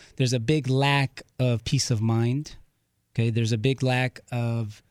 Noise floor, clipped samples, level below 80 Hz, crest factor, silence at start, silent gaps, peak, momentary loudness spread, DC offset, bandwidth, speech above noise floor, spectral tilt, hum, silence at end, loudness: -70 dBFS; under 0.1%; -52 dBFS; 18 dB; 0.2 s; none; -8 dBFS; 8 LU; under 0.1%; 12.5 kHz; 46 dB; -5.5 dB/octave; none; 0.15 s; -25 LUFS